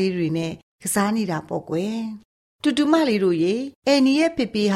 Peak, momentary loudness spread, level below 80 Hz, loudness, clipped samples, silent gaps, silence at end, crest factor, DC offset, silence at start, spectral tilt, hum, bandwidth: -6 dBFS; 11 LU; -60 dBFS; -22 LUFS; under 0.1%; 0.63-0.79 s, 2.25-2.59 s, 3.75-3.82 s; 0 s; 16 dB; under 0.1%; 0 s; -5 dB/octave; none; 15.5 kHz